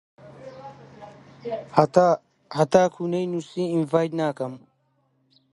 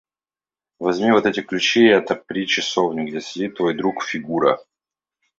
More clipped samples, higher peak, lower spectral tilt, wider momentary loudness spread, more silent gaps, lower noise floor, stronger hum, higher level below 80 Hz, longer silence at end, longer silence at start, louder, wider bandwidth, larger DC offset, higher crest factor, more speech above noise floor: neither; about the same, -2 dBFS vs -2 dBFS; first, -6.5 dB/octave vs -4 dB/octave; first, 24 LU vs 12 LU; neither; second, -68 dBFS vs under -90 dBFS; neither; about the same, -64 dBFS vs -62 dBFS; first, 0.95 s vs 0.75 s; second, 0.25 s vs 0.8 s; second, -23 LUFS vs -19 LUFS; first, 11.5 kHz vs 7.8 kHz; neither; about the same, 24 dB vs 20 dB; second, 46 dB vs over 71 dB